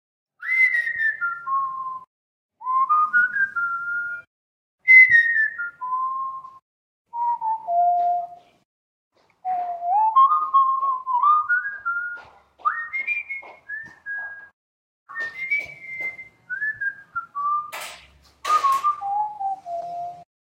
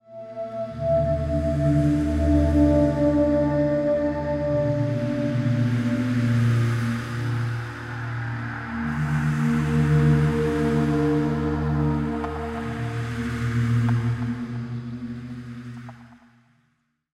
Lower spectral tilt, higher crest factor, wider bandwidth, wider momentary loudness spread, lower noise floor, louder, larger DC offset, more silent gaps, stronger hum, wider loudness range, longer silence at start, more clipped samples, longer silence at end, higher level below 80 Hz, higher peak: second, -1.5 dB/octave vs -8.5 dB/octave; first, 20 dB vs 14 dB; first, 16 kHz vs 12 kHz; first, 17 LU vs 13 LU; second, -50 dBFS vs -70 dBFS; about the same, -21 LUFS vs -23 LUFS; neither; first, 2.07-2.49 s, 4.27-4.78 s, 6.62-7.05 s, 8.65-9.11 s, 14.53-15.06 s vs none; neither; first, 12 LU vs 6 LU; first, 0.4 s vs 0.1 s; neither; second, 0.2 s vs 1 s; second, -70 dBFS vs -36 dBFS; first, -4 dBFS vs -8 dBFS